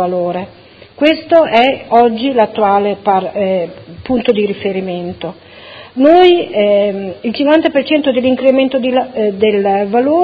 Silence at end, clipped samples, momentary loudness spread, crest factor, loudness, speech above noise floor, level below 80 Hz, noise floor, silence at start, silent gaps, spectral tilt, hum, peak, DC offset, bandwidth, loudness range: 0 s; 0.2%; 12 LU; 12 dB; -12 LUFS; 23 dB; -48 dBFS; -35 dBFS; 0 s; none; -7.5 dB/octave; none; 0 dBFS; under 0.1%; 6.4 kHz; 4 LU